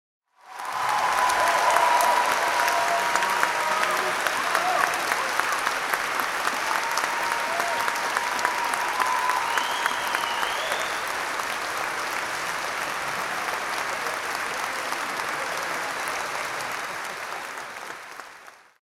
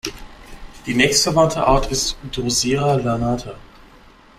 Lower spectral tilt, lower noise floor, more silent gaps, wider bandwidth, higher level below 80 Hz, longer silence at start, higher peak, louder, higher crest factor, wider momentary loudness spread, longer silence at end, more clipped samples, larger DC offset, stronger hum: second, -0.5 dB/octave vs -3.5 dB/octave; about the same, -48 dBFS vs -47 dBFS; neither; about the same, 16.5 kHz vs 16 kHz; second, -64 dBFS vs -34 dBFS; first, 0.45 s vs 0.05 s; about the same, -4 dBFS vs -2 dBFS; second, -25 LUFS vs -18 LUFS; about the same, 22 dB vs 18 dB; second, 9 LU vs 12 LU; second, 0.25 s vs 0.8 s; neither; neither; neither